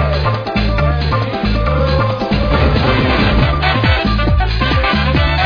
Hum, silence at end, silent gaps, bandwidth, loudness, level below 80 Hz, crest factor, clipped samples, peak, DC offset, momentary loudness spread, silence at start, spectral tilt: none; 0 s; none; 5.4 kHz; -14 LUFS; -18 dBFS; 12 dB; under 0.1%; 0 dBFS; under 0.1%; 4 LU; 0 s; -7.5 dB/octave